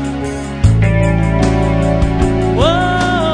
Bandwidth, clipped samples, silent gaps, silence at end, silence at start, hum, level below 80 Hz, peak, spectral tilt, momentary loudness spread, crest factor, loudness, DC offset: 10 kHz; under 0.1%; none; 0 s; 0 s; none; -20 dBFS; 0 dBFS; -7 dB/octave; 4 LU; 12 dB; -14 LUFS; under 0.1%